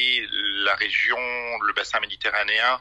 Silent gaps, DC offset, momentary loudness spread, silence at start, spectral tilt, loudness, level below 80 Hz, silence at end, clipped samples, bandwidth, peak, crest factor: none; under 0.1%; 5 LU; 0 s; -0.5 dB/octave; -22 LUFS; -58 dBFS; 0 s; under 0.1%; 10.5 kHz; -8 dBFS; 16 dB